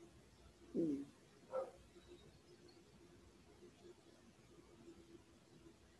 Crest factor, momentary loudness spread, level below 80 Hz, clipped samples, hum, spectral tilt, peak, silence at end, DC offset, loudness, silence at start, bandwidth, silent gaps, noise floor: 22 dB; 23 LU; -74 dBFS; under 0.1%; none; -7 dB/octave; -30 dBFS; 0 s; under 0.1%; -47 LUFS; 0 s; 12 kHz; none; -67 dBFS